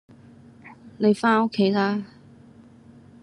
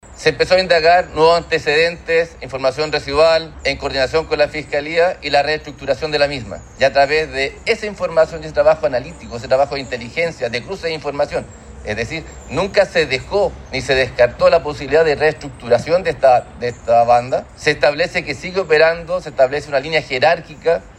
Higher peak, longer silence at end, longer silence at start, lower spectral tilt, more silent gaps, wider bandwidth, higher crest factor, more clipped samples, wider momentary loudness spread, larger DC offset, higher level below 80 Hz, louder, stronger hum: second, -8 dBFS vs 0 dBFS; first, 1.15 s vs 0.05 s; first, 0.65 s vs 0.05 s; first, -6.5 dB/octave vs -4.5 dB/octave; neither; about the same, 10.5 kHz vs 11 kHz; about the same, 18 dB vs 16 dB; neither; about the same, 10 LU vs 10 LU; neither; second, -70 dBFS vs -40 dBFS; second, -22 LUFS vs -16 LUFS; neither